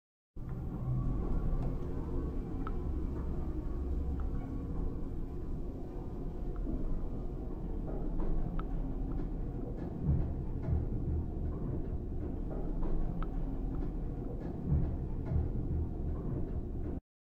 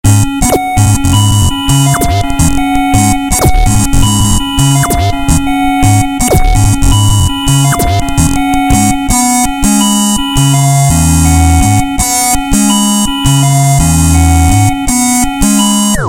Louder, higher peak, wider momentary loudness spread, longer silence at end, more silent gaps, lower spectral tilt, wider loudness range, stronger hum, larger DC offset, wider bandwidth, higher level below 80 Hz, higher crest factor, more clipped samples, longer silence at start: second, -39 LUFS vs -9 LUFS; second, -20 dBFS vs 0 dBFS; first, 7 LU vs 3 LU; first, 0.25 s vs 0 s; neither; first, -11 dB/octave vs -4.5 dB/octave; about the same, 3 LU vs 1 LU; neither; neither; second, 3.3 kHz vs 17 kHz; second, -38 dBFS vs -16 dBFS; first, 14 dB vs 8 dB; second, under 0.1% vs 0.6%; first, 0.35 s vs 0.05 s